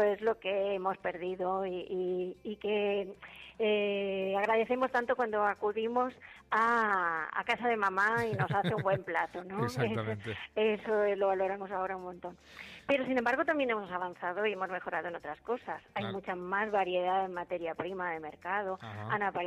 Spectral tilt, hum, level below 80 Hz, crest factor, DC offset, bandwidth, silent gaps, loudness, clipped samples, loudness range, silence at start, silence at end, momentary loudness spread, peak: -6.5 dB/octave; none; -68 dBFS; 16 dB; under 0.1%; 14.5 kHz; none; -33 LUFS; under 0.1%; 4 LU; 0 s; 0 s; 10 LU; -16 dBFS